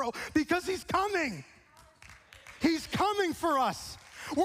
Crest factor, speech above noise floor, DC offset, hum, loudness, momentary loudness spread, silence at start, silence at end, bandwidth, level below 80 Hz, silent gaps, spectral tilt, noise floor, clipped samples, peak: 18 dB; 28 dB; under 0.1%; none; -30 LUFS; 15 LU; 0 s; 0 s; 15.5 kHz; -58 dBFS; none; -4 dB/octave; -58 dBFS; under 0.1%; -14 dBFS